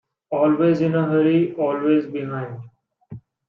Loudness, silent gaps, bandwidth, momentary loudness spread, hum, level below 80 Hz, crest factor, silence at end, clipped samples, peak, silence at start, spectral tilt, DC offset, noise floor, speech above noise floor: -20 LUFS; none; 5.8 kHz; 12 LU; none; -66 dBFS; 14 dB; 0.3 s; under 0.1%; -6 dBFS; 0.3 s; -9.5 dB/octave; under 0.1%; -41 dBFS; 22 dB